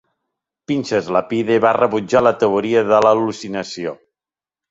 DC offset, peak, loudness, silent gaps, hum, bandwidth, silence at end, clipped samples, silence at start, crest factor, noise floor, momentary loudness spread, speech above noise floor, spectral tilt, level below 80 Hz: under 0.1%; -2 dBFS; -17 LUFS; none; none; 8 kHz; 0.75 s; under 0.1%; 0.7 s; 16 dB; under -90 dBFS; 12 LU; over 74 dB; -5.5 dB/octave; -58 dBFS